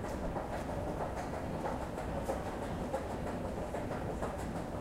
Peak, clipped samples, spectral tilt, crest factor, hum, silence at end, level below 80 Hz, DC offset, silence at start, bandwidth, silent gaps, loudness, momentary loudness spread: -22 dBFS; under 0.1%; -6.5 dB/octave; 16 dB; none; 0 s; -46 dBFS; under 0.1%; 0 s; 16 kHz; none; -39 LUFS; 1 LU